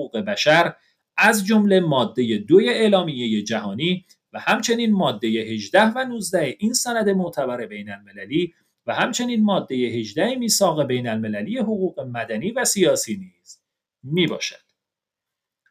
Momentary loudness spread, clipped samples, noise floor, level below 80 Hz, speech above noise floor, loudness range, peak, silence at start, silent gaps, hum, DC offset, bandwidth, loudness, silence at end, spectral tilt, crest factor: 12 LU; under 0.1%; -86 dBFS; -68 dBFS; 65 dB; 5 LU; -2 dBFS; 0 s; none; none; under 0.1%; 15.5 kHz; -21 LUFS; 1.15 s; -4 dB/octave; 20 dB